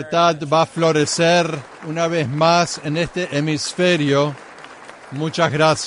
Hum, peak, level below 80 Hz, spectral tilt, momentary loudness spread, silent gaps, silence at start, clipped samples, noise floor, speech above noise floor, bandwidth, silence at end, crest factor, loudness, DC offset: none; -4 dBFS; -54 dBFS; -4.5 dB/octave; 16 LU; none; 0 s; under 0.1%; -39 dBFS; 21 dB; 11 kHz; 0 s; 14 dB; -18 LUFS; under 0.1%